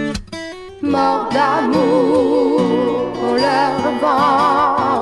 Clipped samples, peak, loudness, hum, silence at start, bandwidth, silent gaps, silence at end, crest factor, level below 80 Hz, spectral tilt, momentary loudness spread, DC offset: under 0.1%; -4 dBFS; -15 LUFS; none; 0 s; 12 kHz; none; 0 s; 12 dB; -44 dBFS; -5.5 dB/octave; 11 LU; under 0.1%